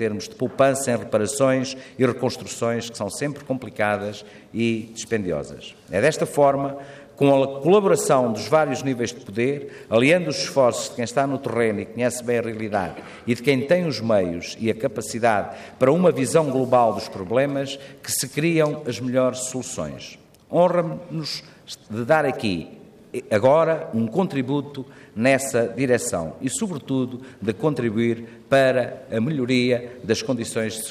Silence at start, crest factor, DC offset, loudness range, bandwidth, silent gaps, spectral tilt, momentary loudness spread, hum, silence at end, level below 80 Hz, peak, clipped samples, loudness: 0 s; 18 dB; under 0.1%; 4 LU; 15.5 kHz; none; -5 dB/octave; 12 LU; none; 0 s; -62 dBFS; -4 dBFS; under 0.1%; -22 LUFS